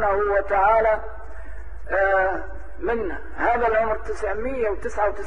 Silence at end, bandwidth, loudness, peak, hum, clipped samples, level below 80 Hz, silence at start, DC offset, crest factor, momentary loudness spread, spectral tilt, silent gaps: 0 s; 10 kHz; -23 LUFS; -8 dBFS; none; under 0.1%; -38 dBFS; 0 s; 3%; 14 dB; 20 LU; -6.5 dB/octave; none